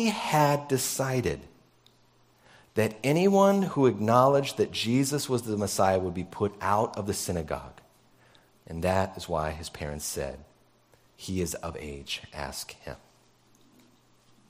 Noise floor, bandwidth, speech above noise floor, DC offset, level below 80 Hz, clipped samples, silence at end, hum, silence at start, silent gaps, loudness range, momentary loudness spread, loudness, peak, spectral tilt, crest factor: -62 dBFS; 16 kHz; 35 dB; under 0.1%; -52 dBFS; under 0.1%; 1.55 s; none; 0 s; none; 13 LU; 16 LU; -27 LUFS; -6 dBFS; -5 dB/octave; 22 dB